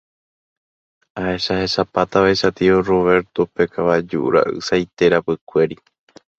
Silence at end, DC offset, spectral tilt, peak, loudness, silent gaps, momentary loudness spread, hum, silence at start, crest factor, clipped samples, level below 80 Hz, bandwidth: 0.65 s; under 0.1%; -5.5 dB/octave; 0 dBFS; -18 LUFS; 5.41-5.47 s; 7 LU; none; 1.15 s; 18 dB; under 0.1%; -48 dBFS; 8 kHz